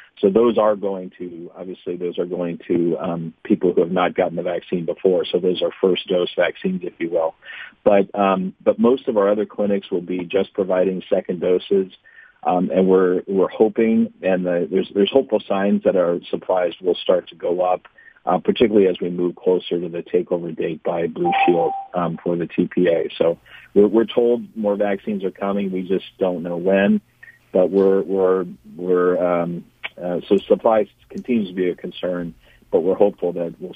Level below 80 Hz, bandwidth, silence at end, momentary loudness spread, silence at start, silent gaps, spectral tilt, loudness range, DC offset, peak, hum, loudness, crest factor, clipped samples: -58 dBFS; 4.9 kHz; 0 s; 10 LU; 0.2 s; none; -9 dB/octave; 3 LU; under 0.1%; 0 dBFS; none; -20 LUFS; 20 dB; under 0.1%